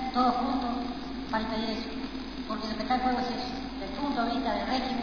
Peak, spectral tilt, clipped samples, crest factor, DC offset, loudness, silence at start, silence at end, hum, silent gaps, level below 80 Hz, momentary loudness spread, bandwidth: -14 dBFS; -5.5 dB/octave; under 0.1%; 16 dB; 0.4%; -31 LUFS; 0 s; 0 s; none; none; -48 dBFS; 9 LU; 5.4 kHz